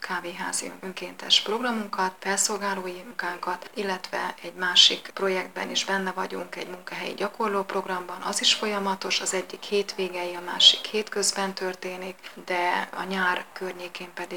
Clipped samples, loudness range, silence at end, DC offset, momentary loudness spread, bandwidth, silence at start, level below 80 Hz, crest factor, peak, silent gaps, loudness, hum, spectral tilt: under 0.1%; 5 LU; 0 s; 0.2%; 17 LU; 19.5 kHz; 0 s; -78 dBFS; 26 dB; -2 dBFS; none; -25 LUFS; none; -1.5 dB/octave